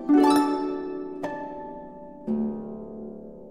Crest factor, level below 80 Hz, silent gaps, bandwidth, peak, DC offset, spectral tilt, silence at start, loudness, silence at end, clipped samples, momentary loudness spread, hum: 18 dB; -58 dBFS; none; 13.5 kHz; -8 dBFS; 0.2%; -5.5 dB/octave; 0 s; -26 LUFS; 0 s; under 0.1%; 21 LU; none